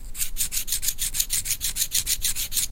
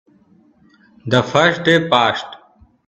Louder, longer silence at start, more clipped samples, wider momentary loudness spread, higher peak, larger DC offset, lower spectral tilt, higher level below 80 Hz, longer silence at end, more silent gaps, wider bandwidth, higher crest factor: second, -24 LUFS vs -15 LUFS; second, 0 s vs 1.05 s; neither; second, 3 LU vs 17 LU; second, -4 dBFS vs 0 dBFS; neither; second, 1 dB/octave vs -5 dB/octave; first, -36 dBFS vs -56 dBFS; second, 0 s vs 0.5 s; neither; first, 17 kHz vs 8.6 kHz; about the same, 22 dB vs 18 dB